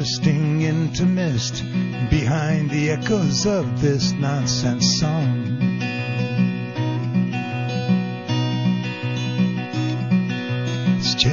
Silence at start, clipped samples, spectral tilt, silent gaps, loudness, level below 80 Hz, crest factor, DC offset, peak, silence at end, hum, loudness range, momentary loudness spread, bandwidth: 0 s; under 0.1%; -5.5 dB/octave; none; -21 LUFS; -42 dBFS; 16 dB; 0.2%; -4 dBFS; 0 s; none; 3 LU; 5 LU; 7.4 kHz